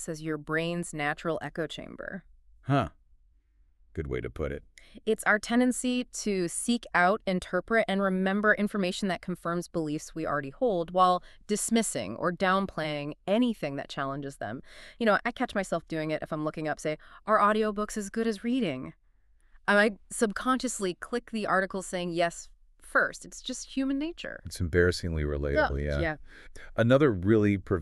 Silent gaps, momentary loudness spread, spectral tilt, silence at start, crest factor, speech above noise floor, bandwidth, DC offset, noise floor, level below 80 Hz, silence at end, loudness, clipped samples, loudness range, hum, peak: none; 12 LU; -5 dB/octave; 0 s; 20 dB; 35 dB; 13.5 kHz; under 0.1%; -64 dBFS; -48 dBFS; 0 s; -29 LUFS; under 0.1%; 5 LU; none; -8 dBFS